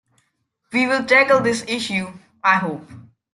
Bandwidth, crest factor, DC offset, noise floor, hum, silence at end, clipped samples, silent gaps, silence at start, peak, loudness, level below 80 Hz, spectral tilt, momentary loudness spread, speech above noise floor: 12 kHz; 18 dB; under 0.1%; -70 dBFS; none; 0.3 s; under 0.1%; none; 0.7 s; -2 dBFS; -18 LUFS; -62 dBFS; -4 dB/octave; 14 LU; 52 dB